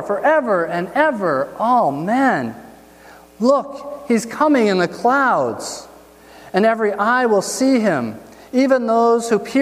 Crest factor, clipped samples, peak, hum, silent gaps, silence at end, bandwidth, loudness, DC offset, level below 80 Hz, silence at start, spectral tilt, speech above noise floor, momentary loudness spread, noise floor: 16 dB; under 0.1%; -2 dBFS; none; none; 0 s; 15.5 kHz; -17 LUFS; under 0.1%; -60 dBFS; 0 s; -5 dB/octave; 27 dB; 8 LU; -44 dBFS